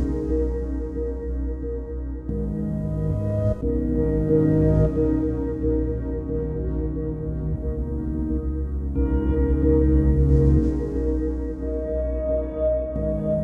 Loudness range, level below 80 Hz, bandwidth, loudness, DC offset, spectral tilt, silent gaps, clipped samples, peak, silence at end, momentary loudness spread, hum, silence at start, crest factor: 6 LU; -26 dBFS; 2.5 kHz; -24 LUFS; under 0.1%; -11.5 dB/octave; none; under 0.1%; -6 dBFS; 0 s; 10 LU; none; 0 s; 16 dB